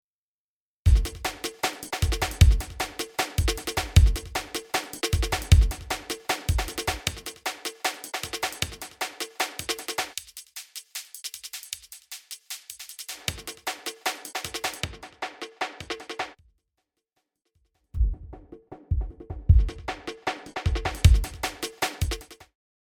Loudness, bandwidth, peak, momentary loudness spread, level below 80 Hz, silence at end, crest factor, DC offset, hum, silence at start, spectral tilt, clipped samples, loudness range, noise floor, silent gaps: -28 LUFS; 19.5 kHz; -4 dBFS; 17 LU; -30 dBFS; 0.55 s; 24 dB; under 0.1%; none; 0.85 s; -4 dB/octave; under 0.1%; 11 LU; under -90 dBFS; none